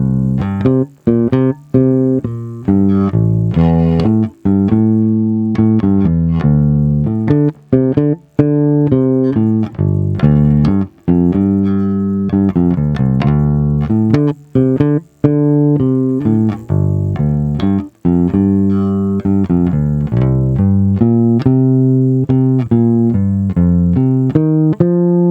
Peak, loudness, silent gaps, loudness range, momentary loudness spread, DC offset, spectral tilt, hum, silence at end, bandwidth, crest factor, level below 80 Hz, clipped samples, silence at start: 0 dBFS; -13 LUFS; none; 2 LU; 4 LU; under 0.1%; -11.5 dB/octave; none; 0 s; 5.4 kHz; 12 dB; -32 dBFS; under 0.1%; 0 s